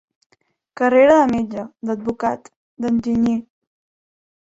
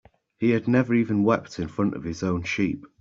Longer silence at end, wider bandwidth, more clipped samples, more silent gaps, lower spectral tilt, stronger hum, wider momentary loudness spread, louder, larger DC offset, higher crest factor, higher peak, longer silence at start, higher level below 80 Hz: first, 1.1 s vs 0.15 s; about the same, 7.8 kHz vs 7.6 kHz; neither; first, 2.56-2.77 s vs none; about the same, -6.5 dB/octave vs -7 dB/octave; neither; first, 15 LU vs 7 LU; first, -18 LUFS vs -24 LUFS; neither; about the same, 18 dB vs 18 dB; first, -2 dBFS vs -6 dBFS; first, 0.8 s vs 0.4 s; about the same, -54 dBFS vs -56 dBFS